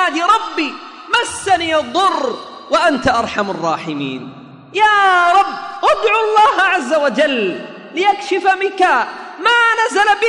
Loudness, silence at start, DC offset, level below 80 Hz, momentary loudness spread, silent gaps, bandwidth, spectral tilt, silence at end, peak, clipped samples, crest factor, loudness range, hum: -14 LUFS; 0 s; under 0.1%; -52 dBFS; 12 LU; none; 11 kHz; -3 dB/octave; 0 s; -2 dBFS; under 0.1%; 14 dB; 3 LU; none